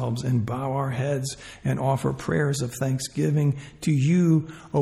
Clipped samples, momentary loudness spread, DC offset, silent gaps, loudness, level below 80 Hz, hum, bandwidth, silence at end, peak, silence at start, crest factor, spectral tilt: under 0.1%; 8 LU; under 0.1%; none; -25 LUFS; -54 dBFS; none; 14 kHz; 0 s; -10 dBFS; 0 s; 14 dB; -6.5 dB/octave